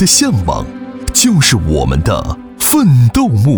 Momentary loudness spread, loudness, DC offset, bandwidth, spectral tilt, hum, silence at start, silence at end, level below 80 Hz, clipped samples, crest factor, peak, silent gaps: 12 LU; -11 LUFS; under 0.1%; over 20 kHz; -4.5 dB/octave; none; 0 s; 0 s; -24 dBFS; under 0.1%; 12 dB; 0 dBFS; none